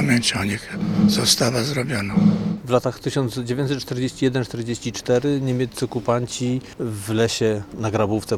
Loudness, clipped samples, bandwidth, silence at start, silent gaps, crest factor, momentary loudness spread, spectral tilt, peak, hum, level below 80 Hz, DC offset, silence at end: -21 LUFS; under 0.1%; 17 kHz; 0 s; none; 20 dB; 8 LU; -5 dB/octave; -2 dBFS; none; -50 dBFS; under 0.1%; 0 s